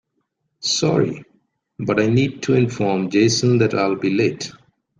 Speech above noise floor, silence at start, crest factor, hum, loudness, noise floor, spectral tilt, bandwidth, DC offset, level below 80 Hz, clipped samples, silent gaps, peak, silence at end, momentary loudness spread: 54 dB; 0.6 s; 16 dB; none; -19 LUFS; -72 dBFS; -5 dB/octave; 10 kHz; under 0.1%; -56 dBFS; under 0.1%; none; -4 dBFS; 0.5 s; 11 LU